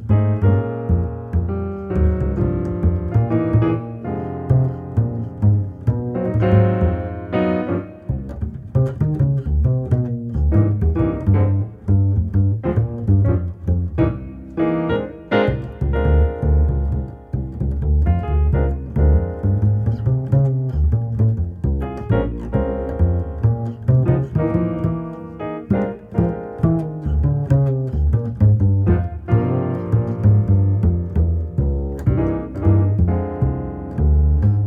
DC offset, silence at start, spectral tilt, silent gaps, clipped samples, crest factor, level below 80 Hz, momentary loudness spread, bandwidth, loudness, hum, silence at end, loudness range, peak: under 0.1%; 0 s; -11 dB/octave; none; under 0.1%; 16 dB; -24 dBFS; 8 LU; 4 kHz; -19 LUFS; none; 0 s; 2 LU; -2 dBFS